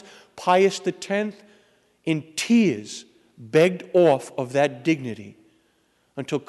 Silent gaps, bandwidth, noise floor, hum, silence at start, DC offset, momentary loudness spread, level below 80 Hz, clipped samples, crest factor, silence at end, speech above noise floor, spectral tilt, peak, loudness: none; 12 kHz; -65 dBFS; none; 0.35 s; under 0.1%; 16 LU; -72 dBFS; under 0.1%; 18 dB; 0.1 s; 44 dB; -5.5 dB/octave; -6 dBFS; -22 LUFS